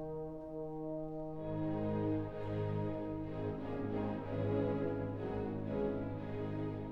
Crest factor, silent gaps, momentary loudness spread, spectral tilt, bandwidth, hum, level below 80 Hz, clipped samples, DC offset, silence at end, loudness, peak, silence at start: 14 dB; none; 7 LU; -10.5 dB/octave; 5.4 kHz; none; -56 dBFS; under 0.1%; under 0.1%; 0 s; -40 LUFS; -24 dBFS; 0 s